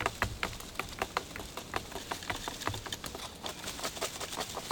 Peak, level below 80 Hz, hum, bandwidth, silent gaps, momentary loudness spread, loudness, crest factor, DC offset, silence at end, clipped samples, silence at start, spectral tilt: -12 dBFS; -52 dBFS; none; over 20 kHz; none; 5 LU; -38 LUFS; 26 dB; under 0.1%; 0 s; under 0.1%; 0 s; -2.5 dB/octave